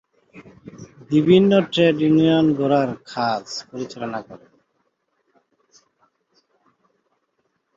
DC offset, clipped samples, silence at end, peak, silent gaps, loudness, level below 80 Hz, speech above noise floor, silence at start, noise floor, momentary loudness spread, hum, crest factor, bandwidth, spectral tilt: under 0.1%; under 0.1%; 3.4 s; -2 dBFS; none; -19 LUFS; -62 dBFS; 53 dB; 0.35 s; -71 dBFS; 17 LU; none; 18 dB; 7.6 kHz; -7 dB/octave